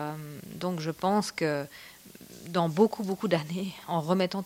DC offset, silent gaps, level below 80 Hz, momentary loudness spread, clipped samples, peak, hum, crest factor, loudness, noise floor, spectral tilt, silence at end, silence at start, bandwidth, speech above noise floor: under 0.1%; none; -68 dBFS; 20 LU; under 0.1%; -10 dBFS; none; 20 dB; -29 LUFS; -49 dBFS; -6 dB/octave; 0 s; 0 s; 16.5 kHz; 21 dB